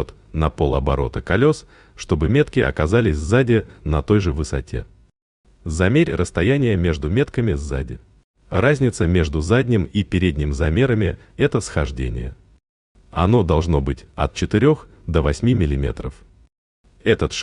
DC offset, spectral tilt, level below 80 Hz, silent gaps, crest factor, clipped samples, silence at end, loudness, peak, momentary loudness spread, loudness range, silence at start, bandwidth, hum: under 0.1%; -7 dB/octave; -32 dBFS; 5.22-5.44 s, 8.24-8.34 s, 12.69-12.95 s, 16.58-16.84 s; 18 dB; under 0.1%; 0 s; -20 LUFS; -2 dBFS; 10 LU; 2 LU; 0 s; 10.5 kHz; none